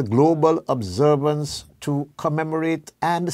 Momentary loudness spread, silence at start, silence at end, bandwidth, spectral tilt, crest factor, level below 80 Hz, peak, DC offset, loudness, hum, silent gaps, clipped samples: 9 LU; 0 s; 0 s; 15 kHz; -6.5 dB/octave; 16 dB; -56 dBFS; -4 dBFS; under 0.1%; -22 LUFS; none; none; under 0.1%